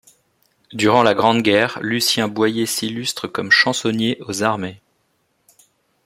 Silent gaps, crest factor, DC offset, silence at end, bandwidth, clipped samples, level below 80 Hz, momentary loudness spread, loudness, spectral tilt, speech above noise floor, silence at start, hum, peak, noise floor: none; 20 dB; under 0.1%; 1.3 s; 16.5 kHz; under 0.1%; -60 dBFS; 10 LU; -17 LUFS; -3.5 dB/octave; 48 dB; 0.7 s; none; 0 dBFS; -66 dBFS